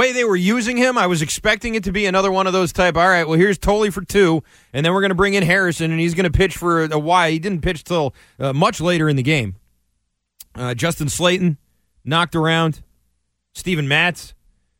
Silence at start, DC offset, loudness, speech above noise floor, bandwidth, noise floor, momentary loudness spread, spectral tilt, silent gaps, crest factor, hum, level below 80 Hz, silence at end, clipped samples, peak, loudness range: 0 s; under 0.1%; -17 LUFS; 54 dB; 16.5 kHz; -71 dBFS; 8 LU; -5 dB/octave; none; 16 dB; none; -38 dBFS; 0.45 s; under 0.1%; -2 dBFS; 4 LU